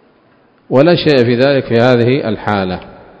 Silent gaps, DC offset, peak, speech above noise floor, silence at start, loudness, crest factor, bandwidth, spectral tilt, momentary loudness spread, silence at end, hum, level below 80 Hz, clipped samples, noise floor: none; under 0.1%; 0 dBFS; 39 dB; 0.7 s; -12 LUFS; 12 dB; 8 kHz; -8 dB/octave; 7 LU; 0.3 s; none; -44 dBFS; 0.3%; -50 dBFS